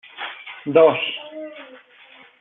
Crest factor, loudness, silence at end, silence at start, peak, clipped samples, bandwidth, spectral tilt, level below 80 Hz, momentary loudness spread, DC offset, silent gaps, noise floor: 20 dB; -18 LUFS; 0.75 s; 0.15 s; -2 dBFS; under 0.1%; 4 kHz; -2.5 dB/octave; -70 dBFS; 21 LU; under 0.1%; none; -49 dBFS